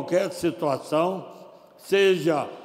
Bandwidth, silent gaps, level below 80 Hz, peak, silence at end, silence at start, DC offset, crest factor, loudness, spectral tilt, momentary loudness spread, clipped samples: 15.5 kHz; none; -68 dBFS; -8 dBFS; 0 s; 0 s; under 0.1%; 16 dB; -24 LUFS; -5 dB/octave; 8 LU; under 0.1%